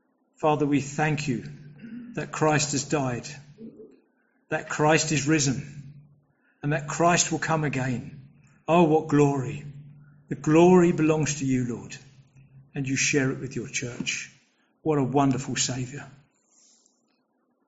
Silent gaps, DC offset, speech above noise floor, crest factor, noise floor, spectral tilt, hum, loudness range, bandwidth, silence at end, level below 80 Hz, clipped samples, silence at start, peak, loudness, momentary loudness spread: none; under 0.1%; 47 dB; 20 dB; -71 dBFS; -5.5 dB/octave; none; 6 LU; 8 kHz; 1.6 s; -58 dBFS; under 0.1%; 0.4 s; -6 dBFS; -24 LUFS; 21 LU